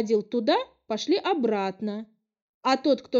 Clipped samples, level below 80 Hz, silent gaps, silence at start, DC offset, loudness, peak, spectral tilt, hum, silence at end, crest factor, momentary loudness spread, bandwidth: under 0.1%; -74 dBFS; 2.42-2.61 s; 0 s; under 0.1%; -26 LUFS; -10 dBFS; -5 dB/octave; none; 0 s; 16 dB; 9 LU; 7.8 kHz